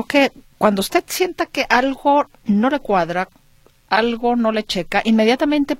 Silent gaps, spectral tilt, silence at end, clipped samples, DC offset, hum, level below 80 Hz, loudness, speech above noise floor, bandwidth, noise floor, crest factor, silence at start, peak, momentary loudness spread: none; -4.5 dB/octave; 0.05 s; under 0.1%; under 0.1%; none; -46 dBFS; -18 LUFS; 35 dB; 16.5 kHz; -53 dBFS; 18 dB; 0 s; 0 dBFS; 6 LU